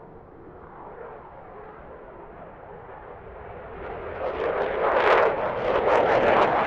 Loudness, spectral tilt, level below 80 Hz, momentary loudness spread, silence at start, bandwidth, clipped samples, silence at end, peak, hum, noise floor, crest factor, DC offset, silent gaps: -22 LUFS; -6 dB/octave; -50 dBFS; 24 LU; 0 s; 8.2 kHz; under 0.1%; 0 s; -4 dBFS; none; -45 dBFS; 22 dB; under 0.1%; none